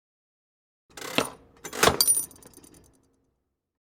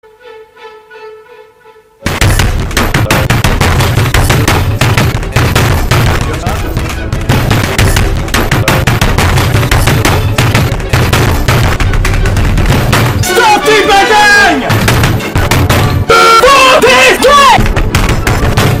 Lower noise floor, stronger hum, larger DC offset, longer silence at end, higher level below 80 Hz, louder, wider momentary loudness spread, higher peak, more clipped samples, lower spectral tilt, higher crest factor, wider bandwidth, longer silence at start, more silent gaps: first, -78 dBFS vs -40 dBFS; neither; neither; first, 1.7 s vs 0 s; second, -56 dBFS vs -16 dBFS; second, -23 LUFS vs -8 LUFS; first, 20 LU vs 8 LU; about the same, -2 dBFS vs 0 dBFS; second, under 0.1% vs 0.5%; second, -1.5 dB/octave vs -4.5 dB/octave; first, 28 dB vs 8 dB; first, over 20 kHz vs 16.5 kHz; first, 0.95 s vs 0.25 s; neither